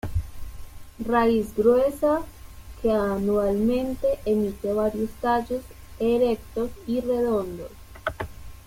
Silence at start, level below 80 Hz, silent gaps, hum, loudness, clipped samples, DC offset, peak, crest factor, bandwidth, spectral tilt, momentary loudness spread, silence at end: 0.05 s; -42 dBFS; none; none; -25 LUFS; under 0.1%; under 0.1%; -6 dBFS; 18 dB; 16.5 kHz; -7 dB/octave; 15 LU; 0.05 s